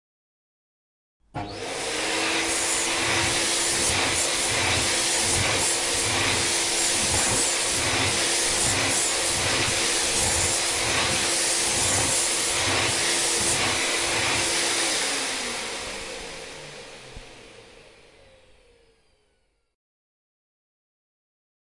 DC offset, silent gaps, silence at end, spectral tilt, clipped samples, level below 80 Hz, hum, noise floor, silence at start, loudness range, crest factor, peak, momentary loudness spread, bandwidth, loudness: under 0.1%; none; 3.8 s; -1 dB/octave; under 0.1%; -48 dBFS; none; -69 dBFS; 1.35 s; 7 LU; 16 dB; -10 dBFS; 11 LU; 11.5 kHz; -21 LUFS